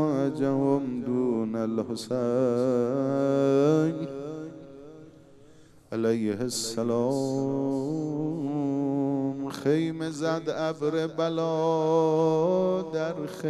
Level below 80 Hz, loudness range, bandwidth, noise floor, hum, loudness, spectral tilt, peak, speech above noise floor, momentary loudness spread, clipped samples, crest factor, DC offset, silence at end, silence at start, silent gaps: -66 dBFS; 4 LU; 13.5 kHz; -53 dBFS; none; -27 LUFS; -6.5 dB/octave; -12 dBFS; 27 dB; 8 LU; under 0.1%; 16 dB; under 0.1%; 0 s; 0 s; none